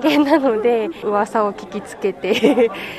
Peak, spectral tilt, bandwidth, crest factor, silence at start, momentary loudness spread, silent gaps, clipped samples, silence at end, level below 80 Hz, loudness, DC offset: 0 dBFS; -5 dB/octave; 13.5 kHz; 18 dB; 0 s; 10 LU; none; under 0.1%; 0 s; -56 dBFS; -18 LUFS; under 0.1%